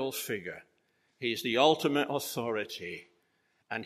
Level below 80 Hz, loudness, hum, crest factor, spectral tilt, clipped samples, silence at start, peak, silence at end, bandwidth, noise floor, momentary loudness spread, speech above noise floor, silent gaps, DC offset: -78 dBFS; -31 LUFS; none; 24 dB; -3.5 dB/octave; under 0.1%; 0 s; -10 dBFS; 0 s; 15 kHz; -74 dBFS; 17 LU; 43 dB; none; under 0.1%